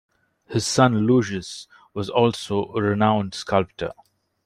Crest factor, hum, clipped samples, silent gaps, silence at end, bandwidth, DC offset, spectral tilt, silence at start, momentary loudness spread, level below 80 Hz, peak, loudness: 20 dB; none; under 0.1%; none; 0.55 s; 15.5 kHz; under 0.1%; -5.5 dB/octave; 0.5 s; 14 LU; -58 dBFS; -4 dBFS; -22 LUFS